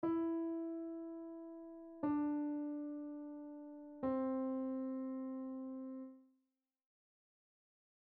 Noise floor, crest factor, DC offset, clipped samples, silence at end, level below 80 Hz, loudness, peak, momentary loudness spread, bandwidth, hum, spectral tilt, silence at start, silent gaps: -87 dBFS; 16 dB; under 0.1%; under 0.1%; 1.95 s; -78 dBFS; -43 LUFS; -28 dBFS; 13 LU; 3.4 kHz; none; -8 dB/octave; 0 s; none